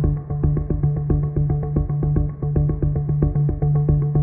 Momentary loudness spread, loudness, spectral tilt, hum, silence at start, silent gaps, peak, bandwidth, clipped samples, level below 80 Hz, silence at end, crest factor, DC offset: 4 LU; -21 LUFS; -15 dB/octave; none; 0 s; none; -4 dBFS; 2.2 kHz; under 0.1%; -26 dBFS; 0 s; 14 dB; under 0.1%